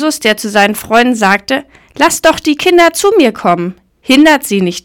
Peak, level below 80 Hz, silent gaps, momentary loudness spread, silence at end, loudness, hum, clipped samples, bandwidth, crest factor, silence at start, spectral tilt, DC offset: 0 dBFS; -44 dBFS; none; 8 LU; 0.05 s; -10 LUFS; none; 2%; 19.5 kHz; 10 dB; 0 s; -3.5 dB/octave; under 0.1%